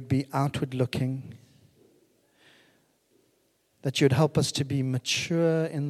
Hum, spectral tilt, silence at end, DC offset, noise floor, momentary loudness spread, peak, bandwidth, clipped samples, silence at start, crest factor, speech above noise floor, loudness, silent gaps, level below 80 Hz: none; -5.5 dB/octave; 0 s; under 0.1%; -69 dBFS; 9 LU; -10 dBFS; 14 kHz; under 0.1%; 0 s; 20 dB; 43 dB; -27 LUFS; none; -62 dBFS